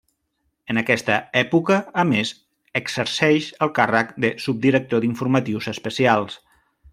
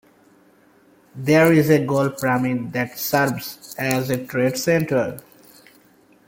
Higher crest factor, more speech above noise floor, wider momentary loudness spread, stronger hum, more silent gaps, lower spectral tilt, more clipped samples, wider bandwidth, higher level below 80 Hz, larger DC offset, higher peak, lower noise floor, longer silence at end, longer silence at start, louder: about the same, 20 dB vs 20 dB; first, 52 dB vs 35 dB; second, 8 LU vs 13 LU; neither; neither; about the same, -5.5 dB/octave vs -5.5 dB/octave; neither; about the same, 15.5 kHz vs 17 kHz; about the same, -62 dBFS vs -58 dBFS; neither; about the same, -2 dBFS vs -2 dBFS; first, -72 dBFS vs -55 dBFS; second, 0.55 s vs 1.05 s; second, 0.7 s vs 1.15 s; about the same, -21 LUFS vs -20 LUFS